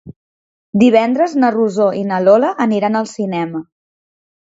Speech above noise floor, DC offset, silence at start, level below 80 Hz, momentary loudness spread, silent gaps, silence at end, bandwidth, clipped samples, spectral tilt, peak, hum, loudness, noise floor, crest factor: over 76 dB; under 0.1%; 0.05 s; -60 dBFS; 10 LU; 0.16-0.73 s; 0.85 s; 7.8 kHz; under 0.1%; -6.5 dB/octave; 0 dBFS; none; -14 LUFS; under -90 dBFS; 16 dB